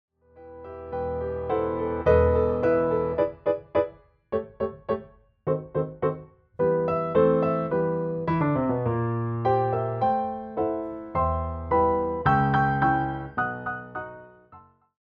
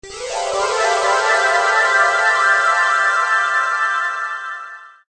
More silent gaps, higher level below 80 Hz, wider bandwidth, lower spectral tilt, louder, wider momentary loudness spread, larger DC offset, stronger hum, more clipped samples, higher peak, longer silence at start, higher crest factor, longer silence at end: neither; first, -46 dBFS vs -56 dBFS; second, 5 kHz vs 9.6 kHz; first, -10 dB/octave vs 0.5 dB/octave; second, -26 LUFS vs -15 LUFS; about the same, 11 LU vs 11 LU; neither; neither; neither; second, -8 dBFS vs -2 dBFS; first, 0.35 s vs 0.05 s; about the same, 18 dB vs 14 dB; first, 0.4 s vs 0.2 s